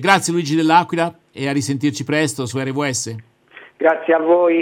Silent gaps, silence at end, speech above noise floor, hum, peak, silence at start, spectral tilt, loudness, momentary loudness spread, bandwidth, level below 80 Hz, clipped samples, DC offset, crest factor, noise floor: none; 0 s; 27 dB; none; 0 dBFS; 0 s; -4.5 dB/octave; -18 LUFS; 9 LU; 17 kHz; -66 dBFS; under 0.1%; under 0.1%; 18 dB; -45 dBFS